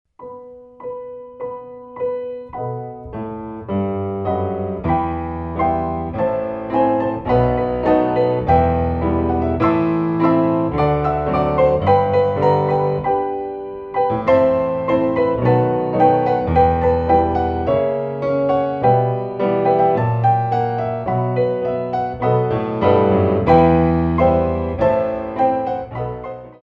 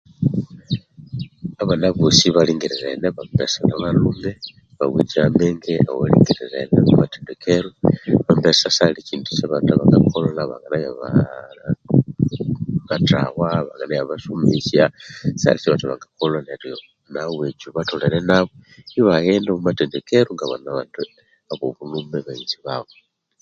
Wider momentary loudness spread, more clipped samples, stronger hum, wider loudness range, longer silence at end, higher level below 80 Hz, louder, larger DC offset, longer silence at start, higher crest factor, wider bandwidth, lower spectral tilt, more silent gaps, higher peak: about the same, 13 LU vs 14 LU; neither; neither; about the same, 7 LU vs 5 LU; second, 0.1 s vs 0.6 s; first, -36 dBFS vs -46 dBFS; about the same, -18 LUFS vs -19 LUFS; neither; about the same, 0.2 s vs 0.2 s; about the same, 16 dB vs 18 dB; second, 5.6 kHz vs 7.8 kHz; first, -10 dB/octave vs -6 dB/octave; neither; about the same, -2 dBFS vs 0 dBFS